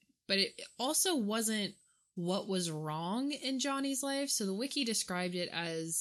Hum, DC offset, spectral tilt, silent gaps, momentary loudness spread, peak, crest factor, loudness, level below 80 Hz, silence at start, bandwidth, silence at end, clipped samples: none; under 0.1%; -3 dB/octave; none; 6 LU; -16 dBFS; 18 dB; -34 LUFS; -82 dBFS; 0.3 s; 15.5 kHz; 0 s; under 0.1%